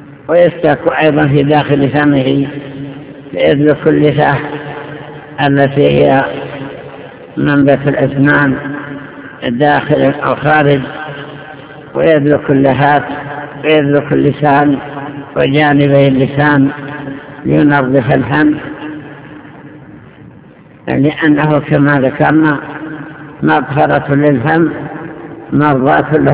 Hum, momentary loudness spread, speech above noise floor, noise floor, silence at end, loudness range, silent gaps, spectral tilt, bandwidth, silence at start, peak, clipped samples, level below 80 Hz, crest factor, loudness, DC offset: none; 17 LU; 28 dB; -38 dBFS; 0 s; 3 LU; none; -11 dB/octave; 4 kHz; 0 s; 0 dBFS; 0.8%; -42 dBFS; 12 dB; -11 LUFS; under 0.1%